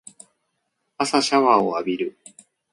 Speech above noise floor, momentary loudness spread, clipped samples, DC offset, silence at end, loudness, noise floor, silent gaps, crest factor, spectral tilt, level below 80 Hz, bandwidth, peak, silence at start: 55 dB; 11 LU; under 0.1%; under 0.1%; 0.6 s; -20 LUFS; -75 dBFS; none; 20 dB; -3.5 dB/octave; -68 dBFS; 11.5 kHz; -2 dBFS; 1 s